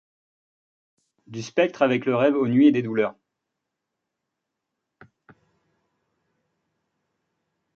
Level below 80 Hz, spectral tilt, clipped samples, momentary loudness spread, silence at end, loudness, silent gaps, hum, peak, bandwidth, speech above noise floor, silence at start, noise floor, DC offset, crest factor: -72 dBFS; -7 dB/octave; under 0.1%; 11 LU; 4.65 s; -21 LUFS; none; none; -6 dBFS; 7 kHz; 62 dB; 1.3 s; -83 dBFS; under 0.1%; 20 dB